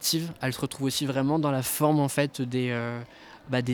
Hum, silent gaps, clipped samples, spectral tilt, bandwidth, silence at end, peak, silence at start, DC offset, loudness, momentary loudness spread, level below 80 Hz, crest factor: none; none; under 0.1%; -5 dB/octave; over 20 kHz; 0 s; -10 dBFS; 0 s; under 0.1%; -27 LUFS; 8 LU; -62 dBFS; 18 dB